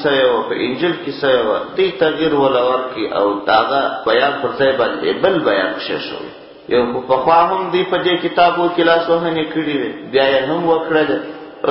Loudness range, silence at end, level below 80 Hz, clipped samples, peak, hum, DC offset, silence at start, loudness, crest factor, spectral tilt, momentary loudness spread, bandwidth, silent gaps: 2 LU; 0 s; -52 dBFS; under 0.1%; 0 dBFS; none; under 0.1%; 0 s; -16 LUFS; 16 dB; -10 dB/octave; 7 LU; 5.8 kHz; none